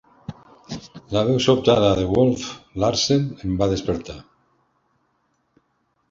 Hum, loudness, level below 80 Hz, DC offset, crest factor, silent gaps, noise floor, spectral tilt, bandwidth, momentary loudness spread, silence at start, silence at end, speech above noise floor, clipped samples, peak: none; -20 LUFS; -44 dBFS; under 0.1%; 20 dB; none; -69 dBFS; -5.5 dB/octave; 7.8 kHz; 21 LU; 0.3 s; 1.9 s; 49 dB; under 0.1%; -2 dBFS